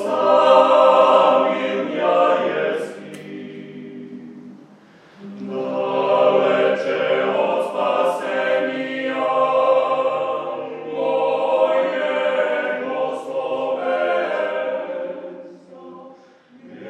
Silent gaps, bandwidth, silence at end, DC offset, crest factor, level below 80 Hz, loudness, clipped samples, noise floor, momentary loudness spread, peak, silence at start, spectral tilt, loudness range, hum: none; 10 kHz; 0 s; under 0.1%; 18 dB; -84 dBFS; -19 LUFS; under 0.1%; -48 dBFS; 21 LU; -2 dBFS; 0 s; -5 dB/octave; 8 LU; none